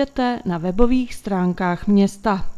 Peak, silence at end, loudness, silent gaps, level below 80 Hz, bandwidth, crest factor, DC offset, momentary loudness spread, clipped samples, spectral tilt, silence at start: 0 dBFS; 0 s; -20 LUFS; none; -34 dBFS; 12.5 kHz; 18 dB; under 0.1%; 6 LU; under 0.1%; -7 dB/octave; 0 s